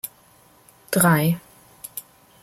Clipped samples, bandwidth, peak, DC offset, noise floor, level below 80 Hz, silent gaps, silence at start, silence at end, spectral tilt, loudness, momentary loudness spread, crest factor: under 0.1%; 16.5 kHz; -4 dBFS; under 0.1%; -54 dBFS; -60 dBFS; none; 0.05 s; 0.4 s; -5 dB/octave; -20 LUFS; 19 LU; 20 dB